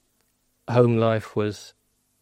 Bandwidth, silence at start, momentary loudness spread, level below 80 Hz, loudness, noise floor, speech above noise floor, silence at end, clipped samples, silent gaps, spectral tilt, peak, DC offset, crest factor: 10.5 kHz; 0.7 s; 19 LU; -64 dBFS; -22 LUFS; -69 dBFS; 47 dB; 0.55 s; under 0.1%; none; -7.5 dB/octave; -4 dBFS; under 0.1%; 20 dB